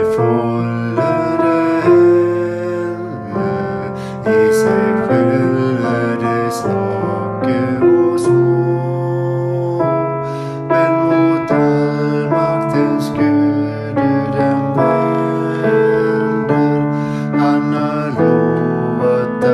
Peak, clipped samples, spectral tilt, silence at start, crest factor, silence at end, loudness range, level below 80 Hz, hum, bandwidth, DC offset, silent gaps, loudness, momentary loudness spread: -2 dBFS; under 0.1%; -8 dB/octave; 0 s; 14 dB; 0 s; 1 LU; -50 dBFS; none; 13 kHz; under 0.1%; none; -15 LUFS; 7 LU